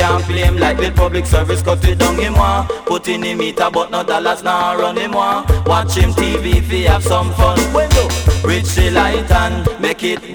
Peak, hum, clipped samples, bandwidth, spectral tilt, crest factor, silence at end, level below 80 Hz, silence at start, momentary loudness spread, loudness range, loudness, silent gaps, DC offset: -2 dBFS; none; under 0.1%; over 20 kHz; -5 dB/octave; 12 dB; 0 s; -20 dBFS; 0 s; 4 LU; 2 LU; -14 LUFS; none; under 0.1%